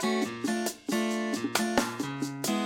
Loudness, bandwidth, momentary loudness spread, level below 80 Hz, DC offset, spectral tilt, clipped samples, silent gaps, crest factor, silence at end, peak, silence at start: -30 LUFS; 17.5 kHz; 5 LU; -64 dBFS; under 0.1%; -3.5 dB/octave; under 0.1%; none; 22 dB; 0 s; -8 dBFS; 0 s